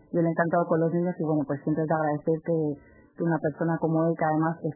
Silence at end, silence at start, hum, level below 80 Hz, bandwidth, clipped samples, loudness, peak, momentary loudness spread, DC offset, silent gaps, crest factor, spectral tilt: 0 s; 0.1 s; none; -64 dBFS; 2.1 kHz; under 0.1%; -26 LUFS; -10 dBFS; 4 LU; under 0.1%; none; 16 dB; -15 dB/octave